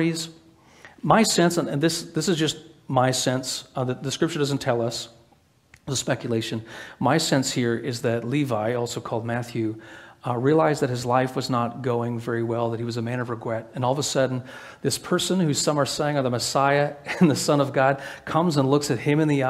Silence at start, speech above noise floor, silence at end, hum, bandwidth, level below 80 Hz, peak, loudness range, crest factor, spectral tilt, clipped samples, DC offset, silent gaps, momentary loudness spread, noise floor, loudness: 0 s; 36 dB; 0 s; none; 16 kHz; -60 dBFS; -2 dBFS; 4 LU; 22 dB; -5 dB/octave; under 0.1%; under 0.1%; none; 10 LU; -59 dBFS; -24 LUFS